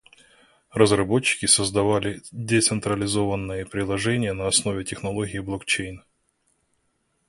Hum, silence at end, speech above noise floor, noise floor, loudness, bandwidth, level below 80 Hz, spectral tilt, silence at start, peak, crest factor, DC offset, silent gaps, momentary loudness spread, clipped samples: none; 1.3 s; 48 dB; -71 dBFS; -23 LUFS; 11.5 kHz; -48 dBFS; -3.5 dB/octave; 0.75 s; -2 dBFS; 24 dB; under 0.1%; none; 11 LU; under 0.1%